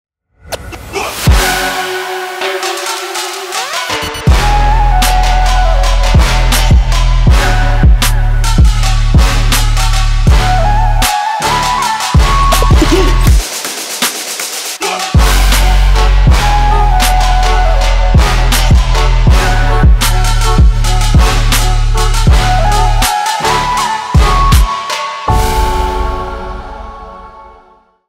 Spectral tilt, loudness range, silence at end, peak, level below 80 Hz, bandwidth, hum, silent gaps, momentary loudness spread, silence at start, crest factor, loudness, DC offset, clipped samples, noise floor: -4 dB/octave; 4 LU; 0.6 s; 0 dBFS; -10 dBFS; 16 kHz; none; none; 8 LU; 0.45 s; 8 dB; -11 LUFS; under 0.1%; 0.3%; -45 dBFS